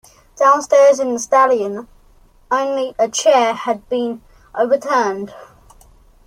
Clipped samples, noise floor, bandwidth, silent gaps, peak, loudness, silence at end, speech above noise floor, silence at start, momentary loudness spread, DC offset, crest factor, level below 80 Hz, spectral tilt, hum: under 0.1%; -49 dBFS; 13.5 kHz; none; -2 dBFS; -16 LUFS; 0.85 s; 34 dB; 0.35 s; 14 LU; under 0.1%; 16 dB; -54 dBFS; -2.5 dB/octave; none